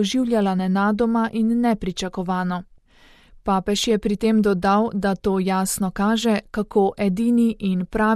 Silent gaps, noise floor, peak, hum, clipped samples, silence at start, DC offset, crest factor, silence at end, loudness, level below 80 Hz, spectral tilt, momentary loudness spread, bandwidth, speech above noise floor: none; -52 dBFS; -8 dBFS; none; under 0.1%; 0 s; under 0.1%; 14 dB; 0 s; -21 LUFS; -44 dBFS; -5.5 dB/octave; 6 LU; 14.5 kHz; 32 dB